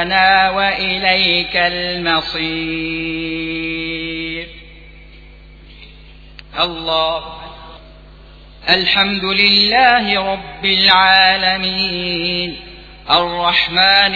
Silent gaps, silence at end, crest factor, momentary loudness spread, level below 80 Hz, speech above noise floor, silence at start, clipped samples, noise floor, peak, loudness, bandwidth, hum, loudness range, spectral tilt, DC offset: none; 0 s; 16 dB; 14 LU; -40 dBFS; 24 dB; 0 s; under 0.1%; -39 dBFS; 0 dBFS; -14 LUFS; 5.4 kHz; none; 12 LU; -5 dB/octave; under 0.1%